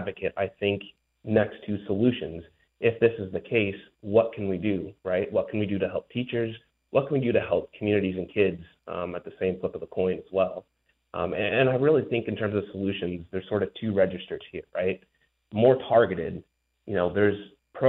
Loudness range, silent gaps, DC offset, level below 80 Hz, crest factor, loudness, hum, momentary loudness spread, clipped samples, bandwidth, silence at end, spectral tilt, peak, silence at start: 3 LU; none; under 0.1%; -60 dBFS; 18 dB; -27 LUFS; none; 13 LU; under 0.1%; 4.2 kHz; 0 s; -10 dB/octave; -8 dBFS; 0 s